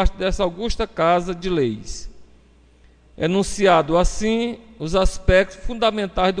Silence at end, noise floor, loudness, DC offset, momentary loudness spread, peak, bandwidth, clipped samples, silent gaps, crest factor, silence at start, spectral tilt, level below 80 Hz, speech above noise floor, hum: 0 s; -52 dBFS; -20 LUFS; under 0.1%; 10 LU; -2 dBFS; 10 kHz; under 0.1%; none; 18 dB; 0 s; -5 dB/octave; -28 dBFS; 32 dB; none